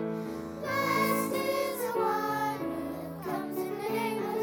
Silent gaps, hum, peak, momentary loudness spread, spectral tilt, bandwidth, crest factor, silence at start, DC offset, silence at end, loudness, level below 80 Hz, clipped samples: none; none; -14 dBFS; 9 LU; -4.5 dB/octave; 19.5 kHz; 16 dB; 0 s; under 0.1%; 0 s; -31 LUFS; -64 dBFS; under 0.1%